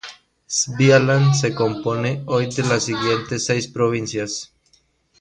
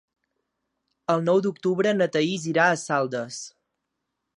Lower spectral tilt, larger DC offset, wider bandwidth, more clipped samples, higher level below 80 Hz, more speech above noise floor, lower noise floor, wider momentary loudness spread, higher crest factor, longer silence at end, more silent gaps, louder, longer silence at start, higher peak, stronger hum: about the same, -4.5 dB/octave vs -5 dB/octave; neither; about the same, 10 kHz vs 11 kHz; neither; first, -56 dBFS vs -76 dBFS; second, 42 dB vs 58 dB; second, -60 dBFS vs -81 dBFS; about the same, 11 LU vs 13 LU; about the same, 18 dB vs 20 dB; second, 0.75 s vs 0.9 s; neither; first, -19 LUFS vs -23 LUFS; second, 0.05 s vs 1.1 s; first, -2 dBFS vs -6 dBFS; neither